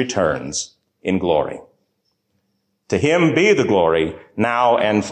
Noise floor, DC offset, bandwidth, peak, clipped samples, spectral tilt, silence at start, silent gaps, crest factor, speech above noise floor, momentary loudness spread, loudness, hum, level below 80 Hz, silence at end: -70 dBFS; under 0.1%; 9.6 kHz; -4 dBFS; under 0.1%; -5 dB/octave; 0 s; none; 14 dB; 53 dB; 12 LU; -18 LUFS; none; -46 dBFS; 0 s